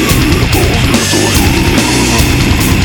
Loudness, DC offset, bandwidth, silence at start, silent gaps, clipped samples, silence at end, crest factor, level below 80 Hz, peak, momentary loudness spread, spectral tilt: -9 LUFS; 0.3%; 19.5 kHz; 0 s; none; under 0.1%; 0 s; 8 dB; -18 dBFS; 0 dBFS; 1 LU; -4 dB/octave